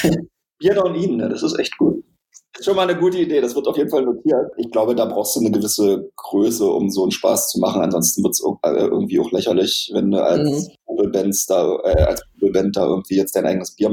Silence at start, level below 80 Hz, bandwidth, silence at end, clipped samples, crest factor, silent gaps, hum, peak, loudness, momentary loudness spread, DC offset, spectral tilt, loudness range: 0 s; -38 dBFS; 17.5 kHz; 0 s; under 0.1%; 16 dB; none; none; -2 dBFS; -18 LUFS; 4 LU; under 0.1%; -4.5 dB/octave; 2 LU